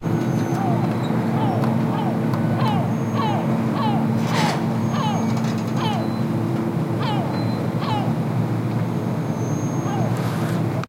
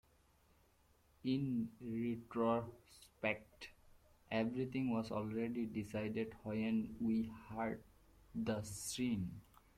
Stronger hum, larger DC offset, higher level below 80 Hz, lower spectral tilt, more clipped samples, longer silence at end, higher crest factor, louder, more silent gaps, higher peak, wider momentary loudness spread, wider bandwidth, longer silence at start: neither; neither; first, -54 dBFS vs -68 dBFS; about the same, -7 dB/octave vs -6 dB/octave; neither; second, 0 s vs 0.35 s; second, 14 dB vs 20 dB; first, -22 LUFS vs -41 LUFS; neither; first, -6 dBFS vs -22 dBFS; second, 3 LU vs 10 LU; about the same, 16 kHz vs 15 kHz; second, 0 s vs 1.25 s